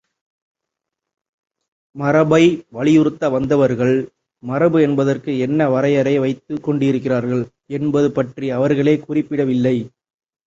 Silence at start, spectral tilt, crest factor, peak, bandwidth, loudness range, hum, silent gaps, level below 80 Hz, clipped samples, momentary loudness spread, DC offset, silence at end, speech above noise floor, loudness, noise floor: 1.95 s; -7.5 dB/octave; 16 dB; -2 dBFS; 7.8 kHz; 3 LU; none; none; -56 dBFS; under 0.1%; 9 LU; under 0.1%; 0.6 s; 66 dB; -17 LUFS; -82 dBFS